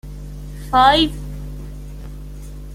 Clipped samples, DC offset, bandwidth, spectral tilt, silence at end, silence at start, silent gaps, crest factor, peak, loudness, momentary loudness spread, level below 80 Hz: under 0.1%; under 0.1%; 16 kHz; -5 dB/octave; 0 s; 0.05 s; none; 20 dB; 0 dBFS; -15 LUFS; 23 LU; -32 dBFS